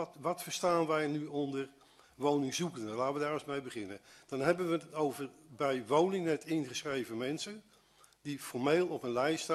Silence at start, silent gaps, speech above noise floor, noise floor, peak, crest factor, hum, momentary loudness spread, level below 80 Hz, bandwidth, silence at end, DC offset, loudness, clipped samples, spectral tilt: 0 s; none; 31 dB; -65 dBFS; -14 dBFS; 20 dB; none; 13 LU; -76 dBFS; 13.5 kHz; 0 s; under 0.1%; -35 LUFS; under 0.1%; -5 dB/octave